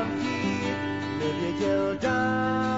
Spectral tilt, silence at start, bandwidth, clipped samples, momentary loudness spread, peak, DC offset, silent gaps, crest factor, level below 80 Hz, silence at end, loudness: -6 dB/octave; 0 s; 8 kHz; under 0.1%; 4 LU; -14 dBFS; 0.2%; none; 12 dB; -56 dBFS; 0 s; -27 LUFS